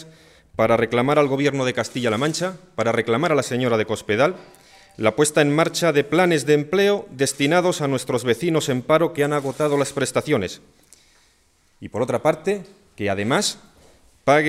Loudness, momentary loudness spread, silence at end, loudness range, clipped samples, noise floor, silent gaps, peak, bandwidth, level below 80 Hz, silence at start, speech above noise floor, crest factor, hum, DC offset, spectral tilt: -20 LUFS; 8 LU; 0 s; 6 LU; under 0.1%; -60 dBFS; none; -4 dBFS; 15.5 kHz; -58 dBFS; 0 s; 40 dB; 18 dB; none; under 0.1%; -4.5 dB/octave